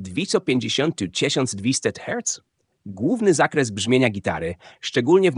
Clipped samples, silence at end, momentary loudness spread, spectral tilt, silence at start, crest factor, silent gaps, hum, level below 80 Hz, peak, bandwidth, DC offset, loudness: under 0.1%; 0 s; 9 LU; -4 dB/octave; 0 s; 18 dB; none; none; -56 dBFS; -2 dBFS; 10.5 kHz; under 0.1%; -22 LUFS